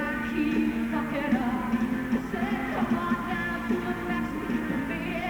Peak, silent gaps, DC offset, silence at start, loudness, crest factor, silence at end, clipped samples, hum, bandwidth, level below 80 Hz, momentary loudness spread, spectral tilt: -14 dBFS; none; under 0.1%; 0 s; -28 LUFS; 14 dB; 0 s; under 0.1%; none; over 20 kHz; -46 dBFS; 3 LU; -6.5 dB/octave